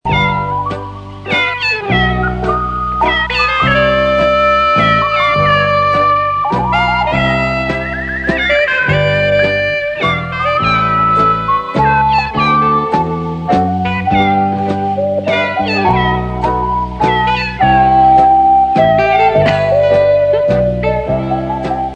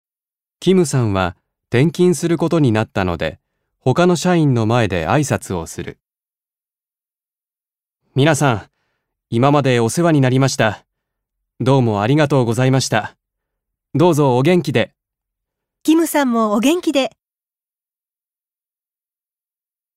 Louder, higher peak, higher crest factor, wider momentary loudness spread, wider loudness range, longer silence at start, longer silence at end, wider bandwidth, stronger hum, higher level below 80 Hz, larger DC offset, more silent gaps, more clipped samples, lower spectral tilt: first, -12 LUFS vs -16 LUFS; about the same, 0 dBFS vs 0 dBFS; second, 12 dB vs 18 dB; second, 6 LU vs 10 LU; about the same, 4 LU vs 6 LU; second, 0.05 s vs 0.6 s; second, 0 s vs 2.9 s; second, 9.2 kHz vs 16 kHz; neither; first, -30 dBFS vs -50 dBFS; neither; neither; neither; about the same, -6.5 dB/octave vs -6 dB/octave